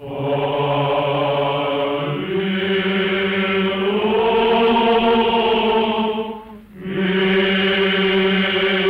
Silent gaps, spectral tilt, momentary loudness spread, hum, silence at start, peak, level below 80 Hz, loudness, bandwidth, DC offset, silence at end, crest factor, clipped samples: none; -7.5 dB/octave; 7 LU; none; 0 s; -6 dBFS; -48 dBFS; -18 LUFS; 5.4 kHz; under 0.1%; 0 s; 12 dB; under 0.1%